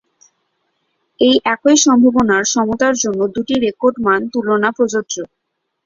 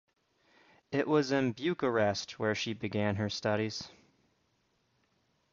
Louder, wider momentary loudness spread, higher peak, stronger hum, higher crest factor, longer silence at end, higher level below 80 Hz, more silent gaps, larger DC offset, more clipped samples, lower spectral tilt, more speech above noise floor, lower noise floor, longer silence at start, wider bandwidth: first, -14 LUFS vs -32 LUFS; about the same, 8 LU vs 7 LU; first, 0 dBFS vs -14 dBFS; neither; second, 14 dB vs 20 dB; second, 0.6 s vs 1.6 s; first, -52 dBFS vs -64 dBFS; neither; neither; neither; second, -3 dB/octave vs -5.5 dB/octave; first, 59 dB vs 44 dB; about the same, -73 dBFS vs -75 dBFS; first, 1.2 s vs 0.9 s; about the same, 7.6 kHz vs 7.6 kHz